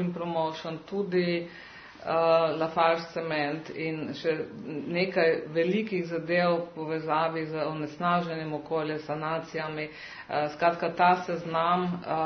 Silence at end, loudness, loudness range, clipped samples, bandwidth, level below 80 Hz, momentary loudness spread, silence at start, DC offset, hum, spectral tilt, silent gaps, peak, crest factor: 0 s; -29 LUFS; 2 LU; under 0.1%; 6.4 kHz; -68 dBFS; 10 LU; 0 s; under 0.1%; none; -7 dB/octave; none; -10 dBFS; 18 dB